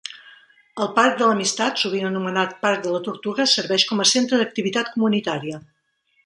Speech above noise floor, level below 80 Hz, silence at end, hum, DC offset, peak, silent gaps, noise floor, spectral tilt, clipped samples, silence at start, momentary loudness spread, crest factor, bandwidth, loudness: 45 dB; -70 dBFS; 0.65 s; none; under 0.1%; -2 dBFS; none; -66 dBFS; -3 dB/octave; under 0.1%; 0.05 s; 11 LU; 20 dB; 11.5 kHz; -20 LUFS